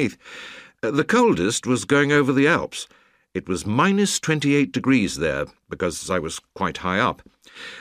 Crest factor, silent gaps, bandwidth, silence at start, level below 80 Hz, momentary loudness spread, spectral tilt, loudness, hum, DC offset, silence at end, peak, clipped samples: 18 dB; none; 15.5 kHz; 0 s; -52 dBFS; 19 LU; -4.5 dB/octave; -21 LUFS; none; under 0.1%; 0 s; -4 dBFS; under 0.1%